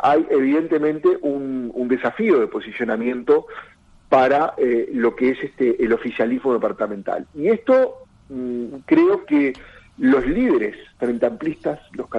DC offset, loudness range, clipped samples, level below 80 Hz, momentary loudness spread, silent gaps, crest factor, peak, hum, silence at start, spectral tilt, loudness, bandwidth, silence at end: under 0.1%; 1 LU; under 0.1%; -48 dBFS; 11 LU; none; 16 dB; -2 dBFS; none; 0 s; -7.5 dB/octave; -20 LUFS; 8 kHz; 0 s